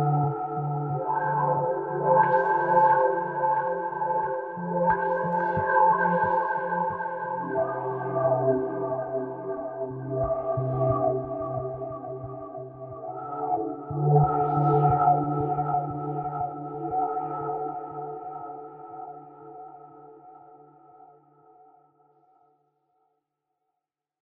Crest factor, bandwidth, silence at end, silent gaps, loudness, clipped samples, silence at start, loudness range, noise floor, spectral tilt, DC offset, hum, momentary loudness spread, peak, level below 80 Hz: 18 dB; 3.7 kHz; 3.65 s; none; -26 LUFS; under 0.1%; 0 s; 11 LU; -86 dBFS; -11.5 dB/octave; under 0.1%; none; 17 LU; -8 dBFS; -56 dBFS